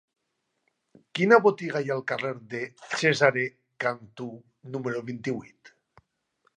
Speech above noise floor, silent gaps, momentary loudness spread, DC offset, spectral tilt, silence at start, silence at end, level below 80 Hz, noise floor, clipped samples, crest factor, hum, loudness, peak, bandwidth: 52 dB; none; 18 LU; under 0.1%; -5 dB/octave; 1.15 s; 1.1 s; -76 dBFS; -79 dBFS; under 0.1%; 24 dB; none; -26 LUFS; -4 dBFS; 10 kHz